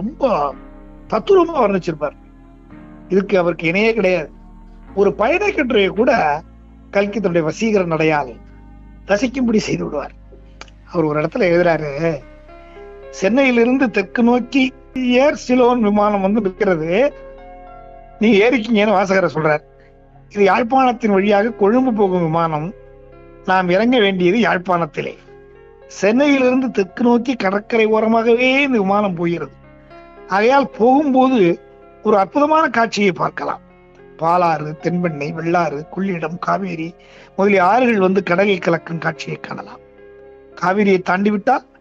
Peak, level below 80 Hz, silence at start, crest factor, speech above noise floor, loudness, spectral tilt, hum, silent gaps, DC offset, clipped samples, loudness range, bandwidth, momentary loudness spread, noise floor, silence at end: -4 dBFS; -46 dBFS; 0 s; 14 dB; 30 dB; -16 LUFS; -6.5 dB/octave; none; none; under 0.1%; under 0.1%; 4 LU; 7.8 kHz; 11 LU; -45 dBFS; 0.2 s